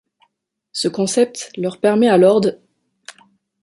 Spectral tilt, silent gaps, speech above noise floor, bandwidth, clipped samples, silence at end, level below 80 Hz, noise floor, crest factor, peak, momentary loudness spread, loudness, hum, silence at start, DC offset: -5 dB/octave; none; 56 dB; 11.5 kHz; under 0.1%; 1.1 s; -64 dBFS; -71 dBFS; 16 dB; -2 dBFS; 13 LU; -16 LUFS; none; 0.75 s; under 0.1%